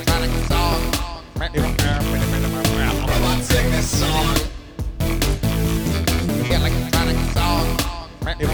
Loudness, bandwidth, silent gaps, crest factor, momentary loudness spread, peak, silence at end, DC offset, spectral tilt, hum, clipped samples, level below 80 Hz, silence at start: -20 LUFS; over 20 kHz; none; 16 dB; 7 LU; -2 dBFS; 0 s; 0.5%; -4.5 dB/octave; none; under 0.1%; -24 dBFS; 0 s